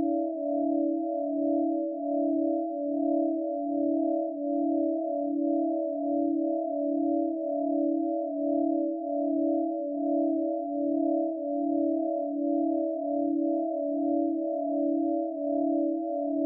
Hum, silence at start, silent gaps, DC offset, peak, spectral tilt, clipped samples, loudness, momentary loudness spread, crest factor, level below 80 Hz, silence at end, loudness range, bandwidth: none; 0 s; none; under 0.1%; -16 dBFS; -13 dB/octave; under 0.1%; -29 LUFS; 3 LU; 12 dB; under -90 dBFS; 0 s; 0 LU; 0.8 kHz